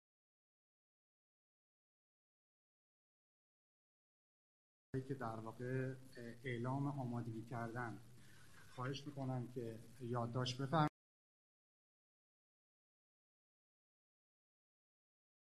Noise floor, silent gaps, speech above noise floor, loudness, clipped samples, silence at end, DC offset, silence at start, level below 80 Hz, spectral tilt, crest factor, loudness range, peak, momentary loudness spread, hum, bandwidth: -64 dBFS; none; 20 dB; -45 LUFS; under 0.1%; 4.6 s; under 0.1%; 4.9 s; -78 dBFS; -6.5 dB/octave; 26 dB; 6 LU; -22 dBFS; 15 LU; none; 12.5 kHz